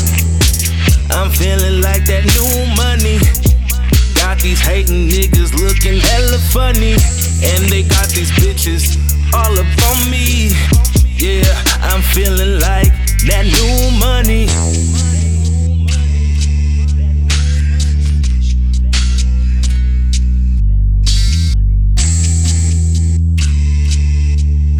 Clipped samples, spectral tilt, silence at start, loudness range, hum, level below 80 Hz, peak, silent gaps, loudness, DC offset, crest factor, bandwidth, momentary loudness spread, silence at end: under 0.1%; -4.5 dB/octave; 0 s; 2 LU; none; -12 dBFS; 0 dBFS; none; -12 LUFS; under 0.1%; 10 dB; over 20 kHz; 3 LU; 0 s